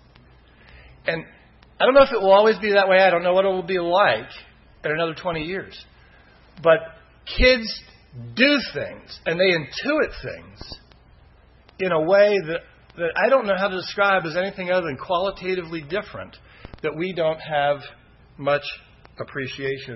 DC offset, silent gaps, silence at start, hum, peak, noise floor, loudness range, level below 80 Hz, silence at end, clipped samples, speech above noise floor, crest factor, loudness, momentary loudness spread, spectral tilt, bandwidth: under 0.1%; none; 0.75 s; none; -4 dBFS; -52 dBFS; 8 LU; -42 dBFS; 0 s; under 0.1%; 31 dB; 18 dB; -21 LUFS; 19 LU; -6 dB/octave; 6 kHz